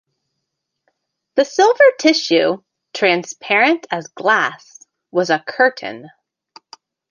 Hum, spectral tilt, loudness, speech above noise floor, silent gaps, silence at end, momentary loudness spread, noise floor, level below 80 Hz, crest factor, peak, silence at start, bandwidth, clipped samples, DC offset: none; -3.5 dB/octave; -16 LUFS; 61 dB; none; 1.05 s; 15 LU; -77 dBFS; -70 dBFS; 18 dB; 0 dBFS; 1.35 s; 9.8 kHz; under 0.1%; under 0.1%